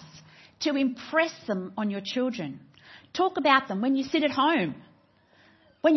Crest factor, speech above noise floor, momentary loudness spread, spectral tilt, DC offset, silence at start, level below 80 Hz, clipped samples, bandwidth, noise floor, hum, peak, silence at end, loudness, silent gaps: 22 dB; 35 dB; 13 LU; -5 dB/octave; under 0.1%; 0 s; -72 dBFS; under 0.1%; 6.2 kHz; -61 dBFS; none; -6 dBFS; 0 s; -27 LUFS; none